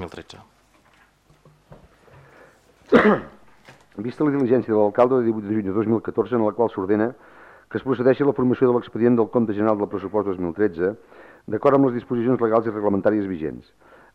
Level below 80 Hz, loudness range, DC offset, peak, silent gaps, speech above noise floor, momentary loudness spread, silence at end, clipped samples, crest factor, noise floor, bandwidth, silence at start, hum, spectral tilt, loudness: -58 dBFS; 4 LU; under 0.1%; -4 dBFS; none; 37 dB; 12 LU; 0.55 s; under 0.1%; 18 dB; -57 dBFS; 7.4 kHz; 0 s; none; -9 dB/octave; -21 LUFS